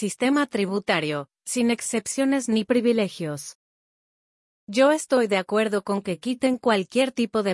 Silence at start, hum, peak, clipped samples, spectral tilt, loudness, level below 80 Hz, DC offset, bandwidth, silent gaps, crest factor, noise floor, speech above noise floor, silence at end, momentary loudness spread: 0 s; none; -8 dBFS; under 0.1%; -4 dB/octave; -23 LUFS; -70 dBFS; under 0.1%; 12 kHz; 3.55-4.67 s; 16 dB; under -90 dBFS; over 67 dB; 0 s; 8 LU